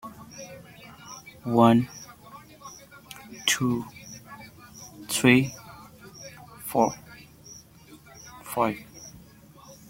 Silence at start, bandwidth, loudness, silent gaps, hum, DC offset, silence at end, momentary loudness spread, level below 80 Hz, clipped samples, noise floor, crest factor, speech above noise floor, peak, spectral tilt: 0.05 s; 17 kHz; -24 LUFS; none; none; under 0.1%; 0.15 s; 27 LU; -62 dBFS; under 0.1%; -51 dBFS; 26 dB; 29 dB; -4 dBFS; -4.5 dB/octave